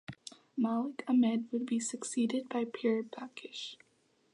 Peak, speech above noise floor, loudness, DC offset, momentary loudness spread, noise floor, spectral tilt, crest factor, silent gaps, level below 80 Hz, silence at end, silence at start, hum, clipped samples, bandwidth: -20 dBFS; 39 dB; -34 LUFS; under 0.1%; 15 LU; -72 dBFS; -4.5 dB/octave; 14 dB; none; -80 dBFS; 0.6 s; 0.1 s; none; under 0.1%; 11 kHz